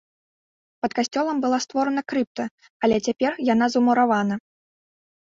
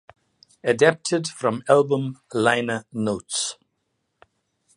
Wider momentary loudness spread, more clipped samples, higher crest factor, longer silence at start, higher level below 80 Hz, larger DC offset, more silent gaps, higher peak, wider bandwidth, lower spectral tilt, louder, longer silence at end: about the same, 10 LU vs 9 LU; neither; second, 16 dB vs 22 dB; first, 0.85 s vs 0.65 s; about the same, -62 dBFS vs -64 dBFS; neither; first, 2.27-2.35 s, 2.51-2.58 s, 2.70-2.80 s vs none; second, -6 dBFS vs -2 dBFS; second, 7.8 kHz vs 11.5 kHz; about the same, -4.5 dB/octave vs -4 dB/octave; about the same, -23 LUFS vs -22 LUFS; second, 1 s vs 1.25 s